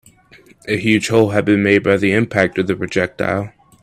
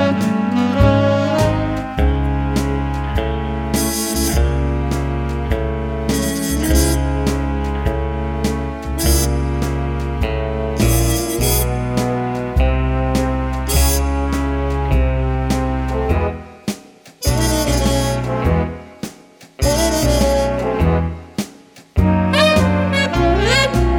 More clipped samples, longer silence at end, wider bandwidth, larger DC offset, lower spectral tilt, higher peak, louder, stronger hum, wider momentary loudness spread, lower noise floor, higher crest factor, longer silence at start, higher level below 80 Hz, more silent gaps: neither; first, 0.35 s vs 0 s; second, 14.5 kHz vs over 20 kHz; neither; about the same, -6 dB/octave vs -5 dB/octave; about the same, 0 dBFS vs 0 dBFS; about the same, -16 LUFS vs -18 LUFS; neither; about the same, 9 LU vs 7 LU; first, -47 dBFS vs -43 dBFS; about the same, 16 dB vs 16 dB; first, 0.65 s vs 0 s; second, -52 dBFS vs -22 dBFS; neither